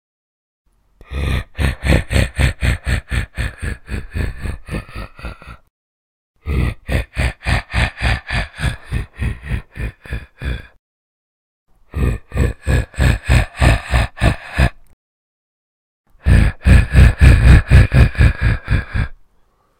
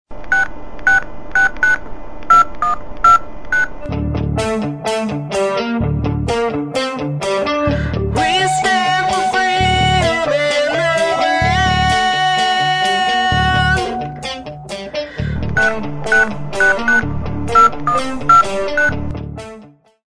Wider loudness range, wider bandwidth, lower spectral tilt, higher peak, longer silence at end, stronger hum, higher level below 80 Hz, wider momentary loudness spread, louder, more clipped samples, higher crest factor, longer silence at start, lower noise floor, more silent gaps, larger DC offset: first, 14 LU vs 4 LU; first, 14 kHz vs 11 kHz; first, -6 dB/octave vs -4.5 dB/octave; about the same, 0 dBFS vs 0 dBFS; first, 0.65 s vs 0 s; neither; first, -20 dBFS vs -30 dBFS; first, 17 LU vs 12 LU; about the same, -17 LUFS vs -15 LUFS; first, 0.2% vs under 0.1%; about the same, 16 dB vs 16 dB; first, 1.1 s vs 0.05 s; first, -56 dBFS vs -41 dBFS; first, 5.70-6.34 s, 10.79-11.66 s, 14.93-16.04 s vs none; neither